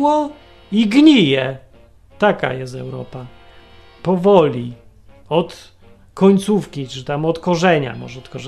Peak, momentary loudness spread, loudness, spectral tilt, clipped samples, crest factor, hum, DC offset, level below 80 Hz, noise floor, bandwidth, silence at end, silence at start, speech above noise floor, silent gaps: 0 dBFS; 19 LU; -16 LUFS; -6.5 dB/octave; under 0.1%; 18 dB; none; under 0.1%; -50 dBFS; -46 dBFS; 12.5 kHz; 0 s; 0 s; 30 dB; none